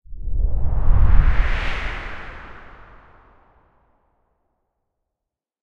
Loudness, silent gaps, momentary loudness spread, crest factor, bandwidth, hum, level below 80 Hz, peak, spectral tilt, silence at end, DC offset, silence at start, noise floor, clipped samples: -23 LUFS; none; 21 LU; 18 dB; 5.2 kHz; none; -22 dBFS; 0 dBFS; -7 dB/octave; 2.55 s; under 0.1%; 0.1 s; -85 dBFS; under 0.1%